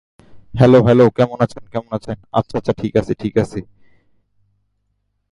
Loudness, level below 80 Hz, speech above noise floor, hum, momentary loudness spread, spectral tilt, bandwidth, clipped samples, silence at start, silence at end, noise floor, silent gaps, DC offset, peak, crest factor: -16 LUFS; -44 dBFS; 53 dB; 50 Hz at -45 dBFS; 15 LU; -8.5 dB/octave; 10.5 kHz; under 0.1%; 0.35 s; 1.7 s; -68 dBFS; none; under 0.1%; 0 dBFS; 18 dB